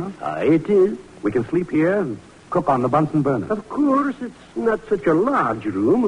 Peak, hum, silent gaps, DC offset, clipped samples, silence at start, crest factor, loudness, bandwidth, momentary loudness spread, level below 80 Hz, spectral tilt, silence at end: -6 dBFS; none; none; under 0.1%; under 0.1%; 0 s; 14 dB; -20 LUFS; 10.5 kHz; 8 LU; -52 dBFS; -8.5 dB/octave; 0 s